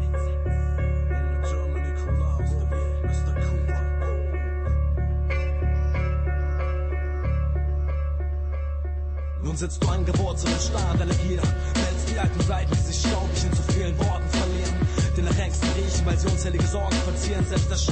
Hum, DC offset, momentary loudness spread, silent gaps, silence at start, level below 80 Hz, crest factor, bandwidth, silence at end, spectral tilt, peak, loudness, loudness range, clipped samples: none; under 0.1%; 4 LU; none; 0 s; -26 dBFS; 12 dB; 8.8 kHz; 0 s; -5.5 dB/octave; -10 dBFS; -25 LUFS; 3 LU; under 0.1%